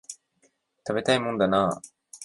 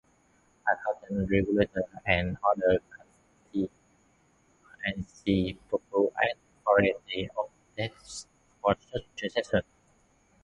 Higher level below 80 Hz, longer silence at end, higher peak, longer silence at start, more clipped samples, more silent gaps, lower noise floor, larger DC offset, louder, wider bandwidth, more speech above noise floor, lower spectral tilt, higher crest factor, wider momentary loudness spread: second, -60 dBFS vs -52 dBFS; second, 0 s vs 0.8 s; about the same, -8 dBFS vs -8 dBFS; second, 0.1 s vs 0.65 s; neither; neither; about the same, -68 dBFS vs -66 dBFS; neither; first, -25 LUFS vs -30 LUFS; about the same, 11.5 kHz vs 11.5 kHz; first, 44 dB vs 37 dB; second, -4.5 dB/octave vs -6 dB/octave; about the same, 20 dB vs 22 dB; first, 21 LU vs 11 LU